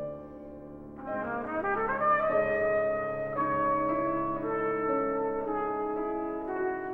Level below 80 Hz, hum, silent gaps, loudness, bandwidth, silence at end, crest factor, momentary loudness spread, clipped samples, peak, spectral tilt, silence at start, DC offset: -56 dBFS; none; none; -30 LUFS; 4.3 kHz; 0 s; 14 dB; 15 LU; under 0.1%; -16 dBFS; -9 dB/octave; 0 s; under 0.1%